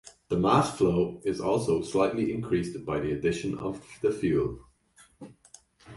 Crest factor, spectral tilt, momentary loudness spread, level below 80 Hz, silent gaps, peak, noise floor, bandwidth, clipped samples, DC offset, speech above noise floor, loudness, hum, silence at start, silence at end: 20 dB; -6.5 dB/octave; 10 LU; -52 dBFS; none; -8 dBFS; -60 dBFS; 11.5 kHz; under 0.1%; under 0.1%; 33 dB; -28 LUFS; none; 0.05 s; 0 s